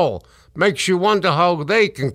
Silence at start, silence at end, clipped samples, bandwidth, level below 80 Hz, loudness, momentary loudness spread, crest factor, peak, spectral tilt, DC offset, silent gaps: 0 s; 0 s; under 0.1%; 15 kHz; -52 dBFS; -17 LUFS; 4 LU; 16 dB; -2 dBFS; -4.5 dB/octave; under 0.1%; none